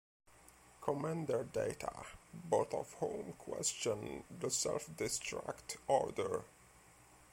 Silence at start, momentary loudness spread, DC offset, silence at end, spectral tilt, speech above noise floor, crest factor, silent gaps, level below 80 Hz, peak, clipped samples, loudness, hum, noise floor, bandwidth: 0.45 s; 10 LU; under 0.1%; 0.1 s; -3.5 dB/octave; 24 dB; 22 dB; none; -68 dBFS; -18 dBFS; under 0.1%; -39 LUFS; none; -63 dBFS; 16.5 kHz